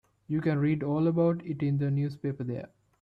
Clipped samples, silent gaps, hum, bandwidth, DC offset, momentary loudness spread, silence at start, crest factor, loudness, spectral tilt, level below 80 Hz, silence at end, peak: under 0.1%; none; none; 4.9 kHz; under 0.1%; 10 LU; 0.3 s; 14 dB; -29 LUFS; -10.5 dB/octave; -64 dBFS; 0.35 s; -14 dBFS